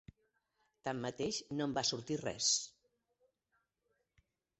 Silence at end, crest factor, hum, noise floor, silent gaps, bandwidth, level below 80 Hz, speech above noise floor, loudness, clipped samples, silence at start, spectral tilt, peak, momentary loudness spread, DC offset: 1.9 s; 22 dB; none; -83 dBFS; none; 8.2 kHz; -72 dBFS; 45 dB; -37 LUFS; under 0.1%; 0.85 s; -2.5 dB/octave; -20 dBFS; 10 LU; under 0.1%